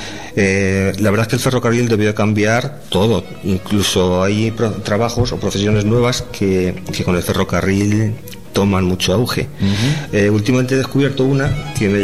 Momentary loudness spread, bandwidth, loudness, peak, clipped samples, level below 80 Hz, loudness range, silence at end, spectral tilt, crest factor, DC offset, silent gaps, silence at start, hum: 5 LU; 14.5 kHz; -16 LUFS; -6 dBFS; under 0.1%; -38 dBFS; 1 LU; 0 s; -5.5 dB/octave; 10 dB; 2%; none; 0 s; none